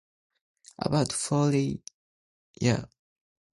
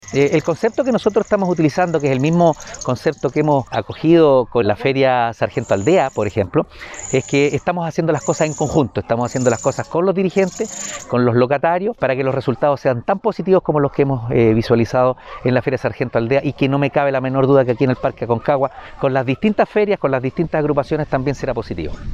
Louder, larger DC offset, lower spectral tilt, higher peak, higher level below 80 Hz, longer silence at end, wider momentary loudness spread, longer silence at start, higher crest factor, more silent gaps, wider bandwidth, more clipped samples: second, -28 LUFS vs -17 LUFS; neither; about the same, -5.5 dB/octave vs -6.5 dB/octave; second, -10 dBFS vs -2 dBFS; second, -58 dBFS vs -44 dBFS; first, 0.75 s vs 0 s; about the same, 8 LU vs 6 LU; first, 0.8 s vs 0.05 s; first, 20 dB vs 14 dB; first, 1.94-2.54 s vs none; about the same, 11.5 kHz vs 12 kHz; neither